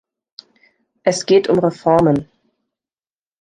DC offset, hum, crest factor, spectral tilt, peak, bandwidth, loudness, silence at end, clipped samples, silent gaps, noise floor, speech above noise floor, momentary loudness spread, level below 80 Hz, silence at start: under 0.1%; none; 18 dB; -6 dB/octave; -2 dBFS; 10 kHz; -16 LUFS; 1.2 s; under 0.1%; none; under -90 dBFS; over 76 dB; 7 LU; -54 dBFS; 1.05 s